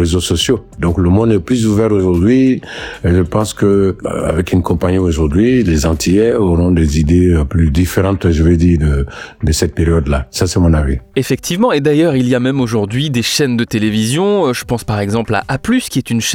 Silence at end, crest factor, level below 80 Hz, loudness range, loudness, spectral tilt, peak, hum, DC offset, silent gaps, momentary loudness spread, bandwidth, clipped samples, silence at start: 0 s; 10 dB; -26 dBFS; 2 LU; -13 LUFS; -6 dB/octave; -2 dBFS; none; under 0.1%; none; 6 LU; 17.5 kHz; under 0.1%; 0 s